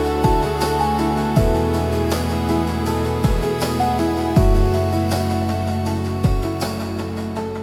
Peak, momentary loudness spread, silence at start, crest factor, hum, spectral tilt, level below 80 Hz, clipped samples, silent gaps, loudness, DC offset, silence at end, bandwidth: -4 dBFS; 6 LU; 0 s; 14 dB; none; -6.5 dB/octave; -26 dBFS; under 0.1%; none; -20 LUFS; under 0.1%; 0 s; 17 kHz